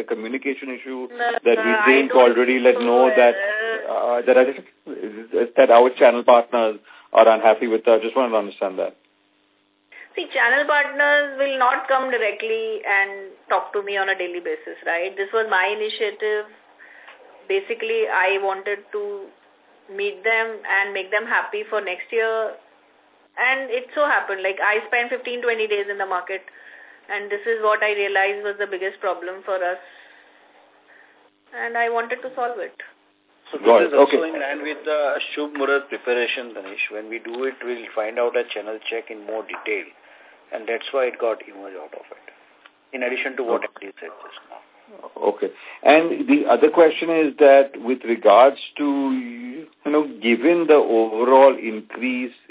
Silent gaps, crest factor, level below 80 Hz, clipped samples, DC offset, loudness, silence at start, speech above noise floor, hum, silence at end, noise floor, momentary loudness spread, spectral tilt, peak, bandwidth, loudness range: none; 20 dB; -76 dBFS; under 0.1%; under 0.1%; -20 LUFS; 0 s; 43 dB; none; 0.2 s; -63 dBFS; 16 LU; -7 dB/octave; 0 dBFS; 4 kHz; 11 LU